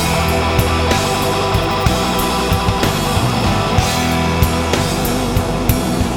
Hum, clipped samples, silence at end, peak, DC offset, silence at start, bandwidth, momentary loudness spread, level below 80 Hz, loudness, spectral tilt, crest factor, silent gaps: none; under 0.1%; 0 s; 0 dBFS; under 0.1%; 0 s; over 20 kHz; 2 LU; -24 dBFS; -16 LUFS; -4.5 dB/octave; 16 dB; none